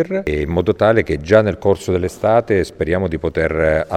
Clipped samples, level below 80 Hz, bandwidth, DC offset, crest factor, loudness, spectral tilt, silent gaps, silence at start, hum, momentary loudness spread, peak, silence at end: under 0.1%; -34 dBFS; 14 kHz; under 0.1%; 16 dB; -17 LUFS; -7 dB/octave; none; 0 s; none; 5 LU; 0 dBFS; 0 s